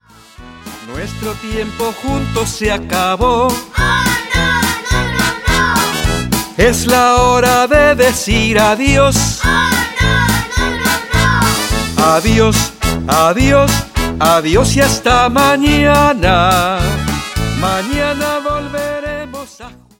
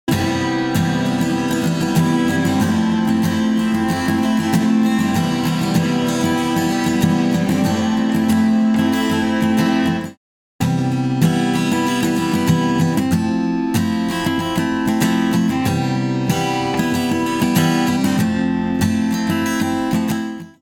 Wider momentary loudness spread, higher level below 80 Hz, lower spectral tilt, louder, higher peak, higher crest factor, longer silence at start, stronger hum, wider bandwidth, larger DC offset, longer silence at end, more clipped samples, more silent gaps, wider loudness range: first, 10 LU vs 3 LU; first, -24 dBFS vs -48 dBFS; second, -4 dB/octave vs -5.5 dB/octave; first, -12 LUFS vs -18 LUFS; about the same, 0 dBFS vs -2 dBFS; about the same, 12 dB vs 14 dB; first, 0.4 s vs 0.05 s; neither; about the same, 17 kHz vs 18 kHz; neither; first, 0.25 s vs 0.1 s; neither; second, none vs 10.17-10.59 s; first, 5 LU vs 1 LU